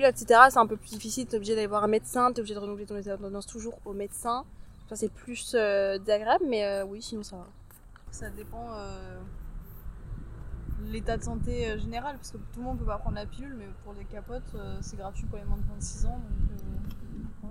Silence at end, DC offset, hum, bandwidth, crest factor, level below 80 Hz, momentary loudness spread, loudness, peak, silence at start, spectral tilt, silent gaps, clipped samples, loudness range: 0 s; under 0.1%; none; 16 kHz; 28 dB; -38 dBFS; 18 LU; -29 LUFS; -2 dBFS; 0 s; -4.5 dB/octave; none; under 0.1%; 10 LU